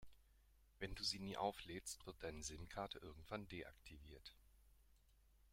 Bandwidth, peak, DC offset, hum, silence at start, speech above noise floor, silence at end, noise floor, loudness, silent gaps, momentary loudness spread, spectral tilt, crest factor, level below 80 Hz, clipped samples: 16.5 kHz; -28 dBFS; under 0.1%; none; 0 s; 23 dB; 0.05 s; -73 dBFS; -50 LUFS; none; 16 LU; -3.5 dB/octave; 24 dB; -66 dBFS; under 0.1%